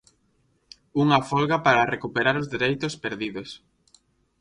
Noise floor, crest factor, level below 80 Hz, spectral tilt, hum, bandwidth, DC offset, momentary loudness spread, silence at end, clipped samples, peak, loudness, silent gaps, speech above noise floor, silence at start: -67 dBFS; 20 dB; -58 dBFS; -5.5 dB/octave; none; 11 kHz; under 0.1%; 13 LU; 0.85 s; under 0.1%; -4 dBFS; -23 LUFS; none; 44 dB; 0.95 s